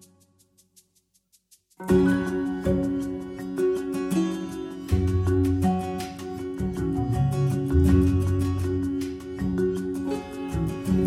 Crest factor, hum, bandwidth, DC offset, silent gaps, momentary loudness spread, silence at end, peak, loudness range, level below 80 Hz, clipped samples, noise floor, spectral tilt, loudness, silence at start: 18 dB; none; 15 kHz; under 0.1%; none; 12 LU; 0 s; -8 dBFS; 2 LU; -36 dBFS; under 0.1%; -68 dBFS; -8 dB/octave; -26 LUFS; 1.8 s